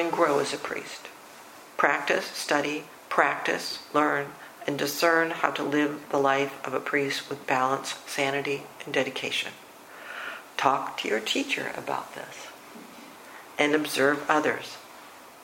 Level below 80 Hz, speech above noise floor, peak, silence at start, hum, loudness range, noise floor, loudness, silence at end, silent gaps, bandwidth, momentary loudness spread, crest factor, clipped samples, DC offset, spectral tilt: -76 dBFS; 20 dB; -4 dBFS; 0 s; none; 4 LU; -47 dBFS; -27 LUFS; 0 s; none; 16.5 kHz; 20 LU; 24 dB; under 0.1%; under 0.1%; -3 dB/octave